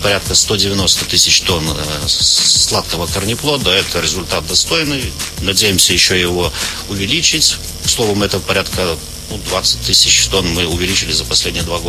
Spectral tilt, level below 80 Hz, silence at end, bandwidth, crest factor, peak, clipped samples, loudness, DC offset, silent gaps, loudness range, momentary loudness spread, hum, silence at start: -2 dB/octave; -30 dBFS; 0 s; over 20 kHz; 14 dB; 0 dBFS; under 0.1%; -12 LUFS; under 0.1%; none; 3 LU; 9 LU; none; 0 s